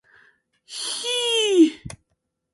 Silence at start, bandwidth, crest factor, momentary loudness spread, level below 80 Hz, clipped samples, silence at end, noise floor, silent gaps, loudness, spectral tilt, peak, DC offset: 0.7 s; 11.5 kHz; 18 dB; 21 LU; -58 dBFS; under 0.1%; 0.6 s; -75 dBFS; none; -20 LUFS; -2.5 dB/octave; -6 dBFS; under 0.1%